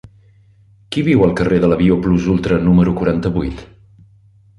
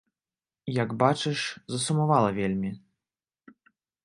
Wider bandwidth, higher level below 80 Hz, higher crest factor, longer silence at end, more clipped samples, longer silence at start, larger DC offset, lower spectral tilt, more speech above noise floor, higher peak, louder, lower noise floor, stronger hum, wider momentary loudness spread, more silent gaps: about the same, 11 kHz vs 11.5 kHz; first, -34 dBFS vs -62 dBFS; second, 14 dB vs 24 dB; second, 0.95 s vs 1.25 s; neither; first, 0.9 s vs 0.65 s; neither; first, -8.5 dB/octave vs -5.5 dB/octave; second, 35 dB vs over 64 dB; first, -2 dBFS vs -6 dBFS; first, -15 LUFS vs -27 LUFS; second, -49 dBFS vs under -90 dBFS; neither; about the same, 9 LU vs 11 LU; neither